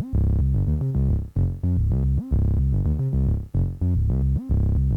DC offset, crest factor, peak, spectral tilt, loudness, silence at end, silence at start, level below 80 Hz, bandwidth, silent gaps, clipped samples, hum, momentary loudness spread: under 0.1%; 10 dB; -10 dBFS; -11.5 dB/octave; -23 LUFS; 0 s; 0 s; -24 dBFS; 1.9 kHz; none; under 0.1%; none; 2 LU